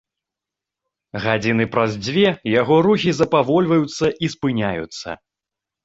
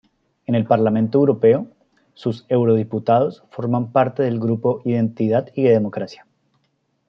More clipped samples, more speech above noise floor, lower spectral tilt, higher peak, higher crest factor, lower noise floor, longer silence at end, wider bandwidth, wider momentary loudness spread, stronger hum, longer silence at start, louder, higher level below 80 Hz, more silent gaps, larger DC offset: neither; first, 68 dB vs 50 dB; second, -6 dB/octave vs -10 dB/octave; about the same, -2 dBFS vs -2 dBFS; about the same, 18 dB vs 16 dB; first, -86 dBFS vs -68 dBFS; second, 0.7 s vs 0.95 s; first, 8 kHz vs 6.4 kHz; first, 14 LU vs 10 LU; neither; first, 1.15 s vs 0.5 s; about the same, -18 LUFS vs -19 LUFS; first, -52 dBFS vs -64 dBFS; neither; neither